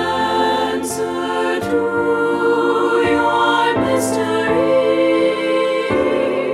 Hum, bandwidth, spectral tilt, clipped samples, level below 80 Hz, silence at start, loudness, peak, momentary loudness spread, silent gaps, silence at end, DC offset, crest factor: none; 15 kHz; -4.5 dB/octave; under 0.1%; -50 dBFS; 0 s; -16 LUFS; -4 dBFS; 4 LU; none; 0 s; under 0.1%; 12 dB